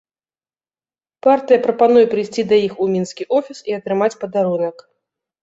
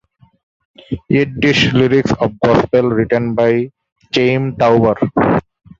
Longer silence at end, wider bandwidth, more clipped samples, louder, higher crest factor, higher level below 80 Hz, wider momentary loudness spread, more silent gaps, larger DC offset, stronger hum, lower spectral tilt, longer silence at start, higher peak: first, 0.7 s vs 0.4 s; about the same, 8 kHz vs 7.8 kHz; neither; second, -17 LUFS vs -14 LUFS; about the same, 16 dB vs 14 dB; second, -64 dBFS vs -42 dBFS; about the same, 9 LU vs 7 LU; second, none vs 3.92-3.96 s; neither; neither; about the same, -6 dB/octave vs -6.5 dB/octave; first, 1.25 s vs 0.9 s; about the same, -2 dBFS vs 0 dBFS